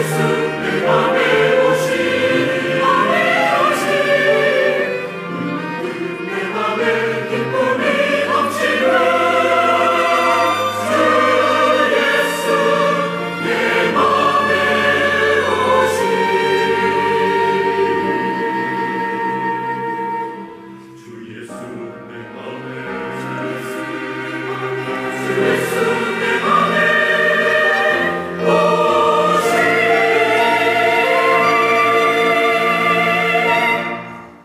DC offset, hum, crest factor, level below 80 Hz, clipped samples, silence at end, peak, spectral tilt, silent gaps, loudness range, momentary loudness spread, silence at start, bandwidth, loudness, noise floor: under 0.1%; none; 12 dB; -62 dBFS; under 0.1%; 0.1 s; -4 dBFS; -4.5 dB/octave; none; 11 LU; 11 LU; 0 s; 16 kHz; -15 LUFS; -36 dBFS